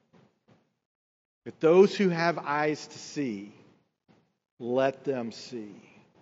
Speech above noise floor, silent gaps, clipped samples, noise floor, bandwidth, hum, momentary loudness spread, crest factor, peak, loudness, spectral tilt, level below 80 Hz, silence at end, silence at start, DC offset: 39 dB; 4.51-4.57 s; under 0.1%; -66 dBFS; 7.8 kHz; none; 23 LU; 22 dB; -8 dBFS; -27 LUFS; -5 dB/octave; -84 dBFS; 0.4 s; 1.45 s; under 0.1%